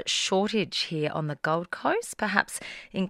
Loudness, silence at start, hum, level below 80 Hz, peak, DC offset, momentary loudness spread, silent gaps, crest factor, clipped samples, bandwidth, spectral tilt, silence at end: -28 LUFS; 0 s; none; -64 dBFS; -2 dBFS; under 0.1%; 6 LU; none; 26 dB; under 0.1%; 16 kHz; -3.5 dB/octave; 0 s